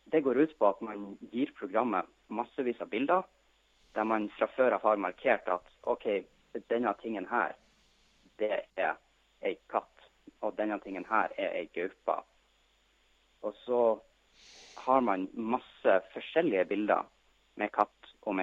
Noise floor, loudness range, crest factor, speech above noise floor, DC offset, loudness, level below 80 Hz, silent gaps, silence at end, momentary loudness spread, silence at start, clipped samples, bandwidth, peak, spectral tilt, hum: -69 dBFS; 5 LU; 22 dB; 38 dB; under 0.1%; -32 LUFS; -72 dBFS; none; 0 s; 12 LU; 0.1 s; under 0.1%; 7.4 kHz; -10 dBFS; -6.5 dB/octave; none